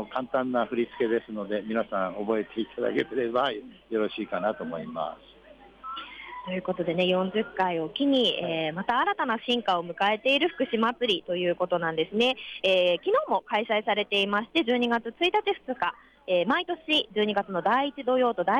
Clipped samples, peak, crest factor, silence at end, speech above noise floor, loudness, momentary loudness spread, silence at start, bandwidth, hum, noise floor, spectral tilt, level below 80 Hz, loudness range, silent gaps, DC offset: under 0.1%; -14 dBFS; 14 dB; 0 s; 24 dB; -27 LUFS; 9 LU; 0 s; 10 kHz; none; -51 dBFS; -5.5 dB/octave; -66 dBFS; 6 LU; none; under 0.1%